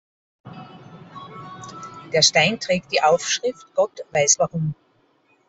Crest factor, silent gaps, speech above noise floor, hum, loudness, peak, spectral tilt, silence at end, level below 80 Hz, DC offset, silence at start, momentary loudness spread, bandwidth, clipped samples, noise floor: 22 dB; none; 42 dB; none; -19 LUFS; -2 dBFS; -2.5 dB/octave; 0.75 s; -62 dBFS; under 0.1%; 0.45 s; 25 LU; 8.2 kHz; under 0.1%; -62 dBFS